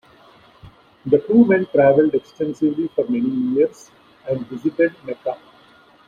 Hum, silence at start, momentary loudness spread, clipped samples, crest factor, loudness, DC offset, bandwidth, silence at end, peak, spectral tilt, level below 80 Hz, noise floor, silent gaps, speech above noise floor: none; 0.65 s; 14 LU; under 0.1%; 18 dB; -19 LUFS; under 0.1%; 7.4 kHz; 0.75 s; -2 dBFS; -8 dB/octave; -60 dBFS; -51 dBFS; none; 32 dB